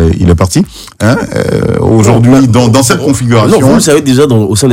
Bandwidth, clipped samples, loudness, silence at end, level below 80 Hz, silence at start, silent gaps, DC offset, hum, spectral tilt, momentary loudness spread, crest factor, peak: 16.5 kHz; 2%; -7 LUFS; 0 s; -26 dBFS; 0 s; none; under 0.1%; none; -6 dB/octave; 6 LU; 6 dB; 0 dBFS